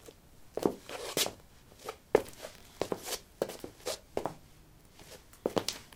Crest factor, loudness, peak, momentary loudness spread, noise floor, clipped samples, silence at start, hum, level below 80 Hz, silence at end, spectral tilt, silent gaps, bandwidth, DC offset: 30 dB; -36 LUFS; -8 dBFS; 21 LU; -58 dBFS; under 0.1%; 0 s; none; -62 dBFS; 0 s; -3 dB/octave; none; 18 kHz; under 0.1%